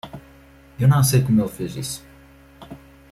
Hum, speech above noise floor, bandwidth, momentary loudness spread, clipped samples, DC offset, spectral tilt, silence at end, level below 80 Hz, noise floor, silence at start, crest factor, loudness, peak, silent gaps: none; 30 dB; 15 kHz; 25 LU; under 0.1%; under 0.1%; -6 dB/octave; 0.35 s; -48 dBFS; -48 dBFS; 0.05 s; 16 dB; -20 LUFS; -6 dBFS; none